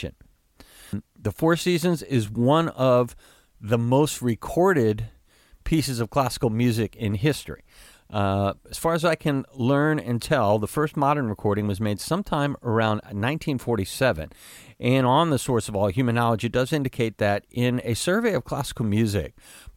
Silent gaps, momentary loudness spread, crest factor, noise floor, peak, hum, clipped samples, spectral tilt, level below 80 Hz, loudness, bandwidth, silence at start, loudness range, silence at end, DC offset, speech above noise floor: none; 9 LU; 16 dB; -56 dBFS; -6 dBFS; none; under 0.1%; -6 dB/octave; -48 dBFS; -24 LUFS; 17 kHz; 0 s; 3 LU; 0.05 s; under 0.1%; 33 dB